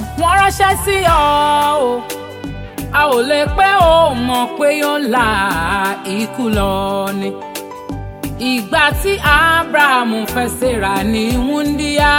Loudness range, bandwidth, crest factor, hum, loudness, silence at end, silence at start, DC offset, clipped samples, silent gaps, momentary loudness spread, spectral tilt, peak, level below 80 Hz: 4 LU; 17 kHz; 14 dB; none; -14 LUFS; 0 s; 0 s; under 0.1%; under 0.1%; none; 15 LU; -4 dB/octave; 0 dBFS; -30 dBFS